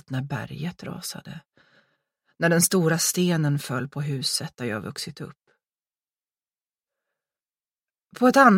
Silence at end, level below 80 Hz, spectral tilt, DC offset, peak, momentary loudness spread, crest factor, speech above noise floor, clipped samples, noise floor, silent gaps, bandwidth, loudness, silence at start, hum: 0 s; -66 dBFS; -4.5 dB/octave; under 0.1%; -2 dBFS; 16 LU; 24 dB; over 67 dB; under 0.1%; under -90 dBFS; none; 16.5 kHz; -24 LUFS; 0.1 s; none